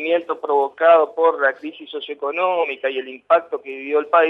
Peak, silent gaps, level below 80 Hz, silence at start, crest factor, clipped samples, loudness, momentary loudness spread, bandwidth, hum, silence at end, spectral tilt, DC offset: -2 dBFS; none; -80 dBFS; 0 s; 16 dB; under 0.1%; -19 LUFS; 15 LU; 4.1 kHz; none; 0 s; -5 dB/octave; under 0.1%